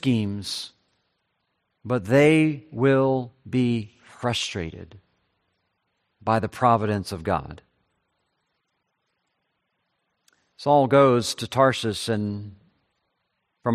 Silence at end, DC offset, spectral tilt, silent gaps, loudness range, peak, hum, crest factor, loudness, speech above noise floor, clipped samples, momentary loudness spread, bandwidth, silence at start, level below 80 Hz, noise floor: 0 s; under 0.1%; -6 dB/octave; none; 7 LU; -4 dBFS; none; 20 dB; -23 LUFS; 54 dB; under 0.1%; 16 LU; 14 kHz; 0.05 s; -60 dBFS; -76 dBFS